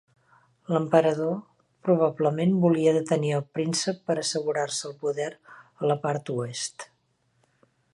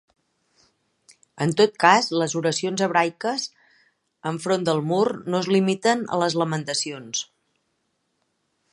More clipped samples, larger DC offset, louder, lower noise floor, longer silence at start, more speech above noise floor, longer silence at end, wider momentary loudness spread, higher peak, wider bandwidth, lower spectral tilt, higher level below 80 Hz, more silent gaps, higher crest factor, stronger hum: neither; neither; second, -26 LUFS vs -22 LUFS; about the same, -70 dBFS vs -73 dBFS; second, 0.7 s vs 1.35 s; second, 45 dB vs 51 dB; second, 1.1 s vs 1.5 s; about the same, 12 LU vs 12 LU; second, -6 dBFS vs 0 dBFS; about the same, 11.5 kHz vs 11.5 kHz; first, -5.5 dB/octave vs -4 dB/octave; about the same, -74 dBFS vs -72 dBFS; neither; about the same, 20 dB vs 24 dB; neither